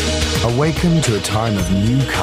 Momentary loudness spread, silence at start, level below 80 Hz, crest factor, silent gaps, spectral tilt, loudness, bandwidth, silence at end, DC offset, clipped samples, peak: 2 LU; 0 s; -28 dBFS; 14 dB; none; -5 dB/octave; -17 LUFS; 16 kHz; 0 s; under 0.1%; under 0.1%; -2 dBFS